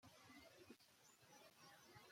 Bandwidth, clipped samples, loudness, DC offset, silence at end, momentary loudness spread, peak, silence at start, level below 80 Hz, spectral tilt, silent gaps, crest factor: 16.5 kHz; under 0.1%; -66 LUFS; under 0.1%; 0 s; 4 LU; -50 dBFS; 0 s; under -90 dBFS; -3 dB/octave; none; 16 dB